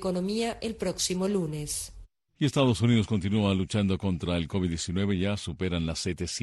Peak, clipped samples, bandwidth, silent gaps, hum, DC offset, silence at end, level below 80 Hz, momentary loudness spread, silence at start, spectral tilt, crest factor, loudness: -12 dBFS; under 0.1%; 12.5 kHz; none; none; under 0.1%; 0 s; -48 dBFS; 7 LU; 0 s; -5.5 dB/octave; 16 dB; -28 LUFS